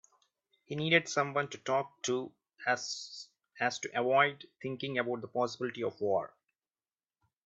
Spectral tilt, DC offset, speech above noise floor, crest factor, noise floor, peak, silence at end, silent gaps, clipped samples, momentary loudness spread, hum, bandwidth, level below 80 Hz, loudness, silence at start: -4 dB/octave; under 0.1%; over 57 dB; 24 dB; under -90 dBFS; -12 dBFS; 1.2 s; none; under 0.1%; 15 LU; none; 8.2 kHz; -80 dBFS; -33 LUFS; 0.7 s